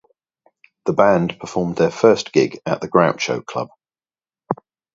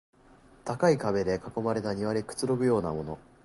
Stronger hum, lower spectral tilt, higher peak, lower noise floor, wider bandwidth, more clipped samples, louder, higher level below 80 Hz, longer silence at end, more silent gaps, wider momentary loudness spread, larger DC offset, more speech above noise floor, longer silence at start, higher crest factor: neither; about the same, -5.5 dB/octave vs -6.5 dB/octave; first, 0 dBFS vs -12 dBFS; first, under -90 dBFS vs -57 dBFS; second, 7.8 kHz vs 11.5 kHz; neither; first, -19 LUFS vs -29 LUFS; about the same, -56 dBFS vs -56 dBFS; first, 0.4 s vs 0.25 s; neither; first, 14 LU vs 11 LU; neither; first, over 72 dB vs 29 dB; first, 0.85 s vs 0.65 s; about the same, 20 dB vs 18 dB